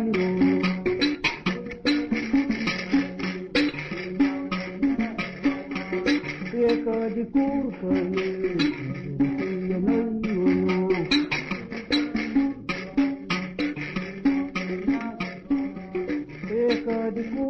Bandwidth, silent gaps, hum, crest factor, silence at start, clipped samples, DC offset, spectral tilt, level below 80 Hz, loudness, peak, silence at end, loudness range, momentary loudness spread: 7 kHz; none; none; 14 dB; 0 s; under 0.1%; under 0.1%; -6.5 dB/octave; -50 dBFS; -26 LUFS; -10 dBFS; 0 s; 3 LU; 8 LU